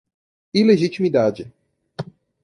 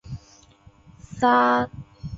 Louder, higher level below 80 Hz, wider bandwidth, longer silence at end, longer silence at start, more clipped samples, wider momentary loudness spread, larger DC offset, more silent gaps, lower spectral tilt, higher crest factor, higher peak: first, -18 LUFS vs -21 LUFS; second, -62 dBFS vs -50 dBFS; first, 10.5 kHz vs 7.8 kHz; first, 0.4 s vs 0 s; first, 0.55 s vs 0.05 s; neither; about the same, 21 LU vs 22 LU; neither; neither; about the same, -7 dB/octave vs -6 dB/octave; about the same, 18 dB vs 18 dB; first, -2 dBFS vs -6 dBFS